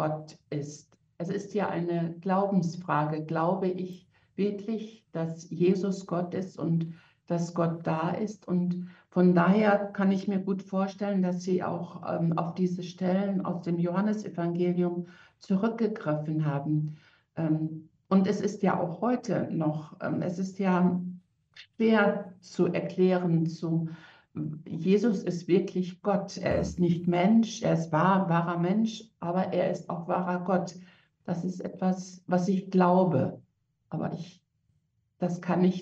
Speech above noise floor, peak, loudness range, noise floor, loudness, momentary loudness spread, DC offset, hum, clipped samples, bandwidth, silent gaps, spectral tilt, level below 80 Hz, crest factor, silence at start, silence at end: 45 dB; -10 dBFS; 4 LU; -73 dBFS; -29 LUFS; 12 LU; under 0.1%; none; under 0.1%; 7.8 kHz; none; -7.5 dB/octave; -62 dBFS; 18 dB; 0 s; 0 s